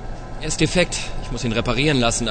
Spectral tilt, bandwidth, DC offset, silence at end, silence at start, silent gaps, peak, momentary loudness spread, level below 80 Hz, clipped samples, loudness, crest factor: -4 dB/octave; 9.4 kHz; under 0.1%; 0 s; 0 s; none; -2 dBFS; 12 LU; -30 dBFS; under 0.1%; -21 LUFS; 20 dB